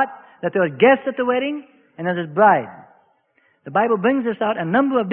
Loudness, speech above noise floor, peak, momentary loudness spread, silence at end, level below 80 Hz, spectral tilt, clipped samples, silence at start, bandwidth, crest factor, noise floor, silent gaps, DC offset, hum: -19 LUFS; 44 dB; -2 dBFS; 12 LU; 0 s; -64 dBFS; -11 dB/octave; under 0.1%; 0 s; 3.7 kHz; 18 dB; -62 dBFS; none; under 0.1%; none